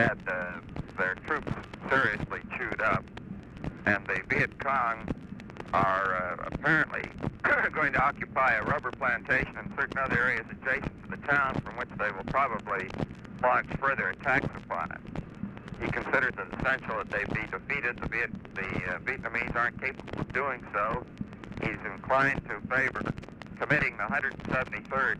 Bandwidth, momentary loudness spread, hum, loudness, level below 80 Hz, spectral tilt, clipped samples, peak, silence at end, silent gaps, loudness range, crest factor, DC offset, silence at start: 11.5 kHz; 12 LU; none; -30 LUFS; -50 dBFS; -6.5 dB/octave; under 0.1%; -10 dBFS; 0 s; none; 4 LU; 20 dB; under 0.1%; 0 s